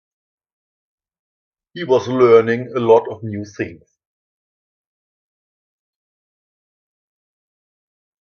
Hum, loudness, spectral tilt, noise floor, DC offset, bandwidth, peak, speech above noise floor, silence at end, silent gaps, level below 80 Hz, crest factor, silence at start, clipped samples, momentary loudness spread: none; -15 LUFS; -7 dB/octave; under -90 dBFS; under 0.1%; 6.6 kHz; 0 dBFS; over 74 dB; 4.5 s; none; -64 dBFS; 22 dB; 1.75 s; under 0.1%; 16 LU